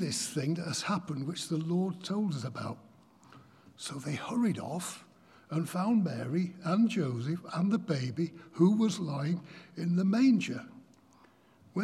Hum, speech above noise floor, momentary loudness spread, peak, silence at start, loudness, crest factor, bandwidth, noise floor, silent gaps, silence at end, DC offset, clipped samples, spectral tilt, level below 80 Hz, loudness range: none; 31 dB; 14 LU; -14 dBFS; 0 s; -32 LUFS; 18 dB; 14 kHz; -62 dBFS; none; 0 s; under 0.1%; under 0.1%; -6 dB/octave; -80 dBFS; 6 LU